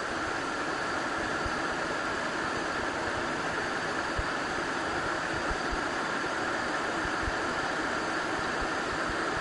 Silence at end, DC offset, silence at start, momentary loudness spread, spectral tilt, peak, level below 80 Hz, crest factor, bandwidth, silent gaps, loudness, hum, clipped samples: 0 s; under 0.1%; 0 s; 1 LU; -3.5 dB/octave; -18 dBFS; -48 dBFS; 14 dB; 10.5 kHz; none; -31 LUFS; none; under 0.1%